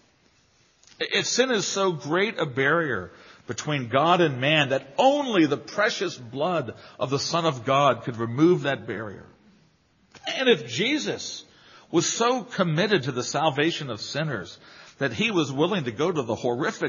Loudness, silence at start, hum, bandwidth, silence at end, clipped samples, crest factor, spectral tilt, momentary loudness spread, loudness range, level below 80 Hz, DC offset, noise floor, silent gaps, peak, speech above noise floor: -24 LUFS; 1 s; none; 7.4 kHz; 0 s; under 0.1%; 20 dB; -3.5 dB/octave; 12 LU; 3 LU; -68 dBFS; under 0.1%; -62 dBFS; none; -6 dBFS; 38 dB